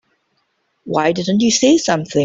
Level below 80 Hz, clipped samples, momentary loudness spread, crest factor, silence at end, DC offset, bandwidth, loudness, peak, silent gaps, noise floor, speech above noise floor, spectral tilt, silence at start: -56 dBFS; under 0.1%; 5 LU; 14 dB; 0 s; under 0.1%; 8 kHz; -15 LUFS; -2 dBFS; none; -66 dBFS; 52 dB; -4 dB/octave; 0.85 s